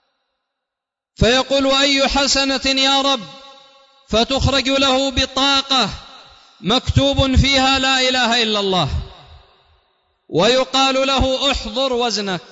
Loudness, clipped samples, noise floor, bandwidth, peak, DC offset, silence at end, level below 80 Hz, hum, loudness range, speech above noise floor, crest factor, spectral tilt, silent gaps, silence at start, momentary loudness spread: -15 LUFS; under 0.1%; -84 dBFS; 8 kHz; 0 dBFS; under 0.1%; 0.05 s; -32 dBFS; none; 2 LU; 67 dB; 16 dB; -3.5 dB/octave; none; 1.2 s; 7 LU